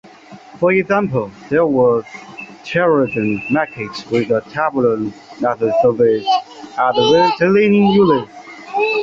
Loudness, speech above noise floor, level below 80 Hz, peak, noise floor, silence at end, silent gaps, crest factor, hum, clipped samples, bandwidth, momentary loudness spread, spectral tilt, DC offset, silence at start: -16 LUFS; 25 dB; -54 dBFS; -2 dBFS; -39 dBFS; 0 s; none; 14 dB; none; under 0.1%; 7.6 kHz; 14 LU; -6.5 dB/octave; under 0.1%; 0.3 s